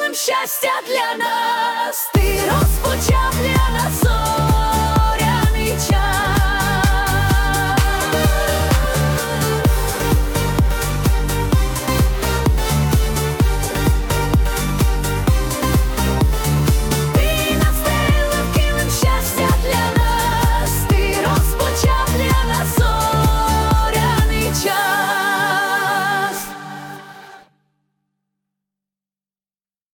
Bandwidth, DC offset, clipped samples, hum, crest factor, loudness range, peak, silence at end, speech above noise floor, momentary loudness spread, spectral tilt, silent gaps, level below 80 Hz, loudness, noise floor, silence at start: 19 kHz; under 0.1%; under 0.1%; none; 14 dB; 2 LU; -4 dBFS; 2.55 s; over 73 dB; 3 LU; -4.5 dB/octave; none; -22 dBFS; -17 LUFS; under -90 dBFS; 0 s